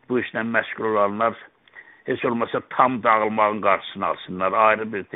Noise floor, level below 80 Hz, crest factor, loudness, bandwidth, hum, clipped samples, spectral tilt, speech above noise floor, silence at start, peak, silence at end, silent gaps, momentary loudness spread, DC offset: -48 dBFS; -66 dBFS; 22 dB; -22 LUFS; 4 kHz; none; under 0.1%; -3.5 dB/octave; 26 dB; 0.1 s; 0 dBFS; 0.1 s; none; 8 LU; under 0.1%